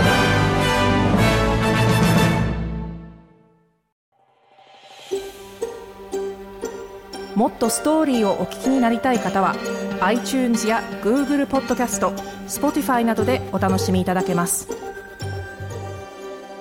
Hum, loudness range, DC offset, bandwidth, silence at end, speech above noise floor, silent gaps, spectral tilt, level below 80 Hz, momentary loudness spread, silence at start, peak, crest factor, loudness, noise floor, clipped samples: none; 13 LU; under 0.1%; 17 kHz; 0 s; 39 dB; 3.92-4.12 s; -5 dB/octave; -38 dBFS; 15 LU; 0 s; -6 dBFS; 16 dB; -20 LUFS; -59 dBFS; under 0.1%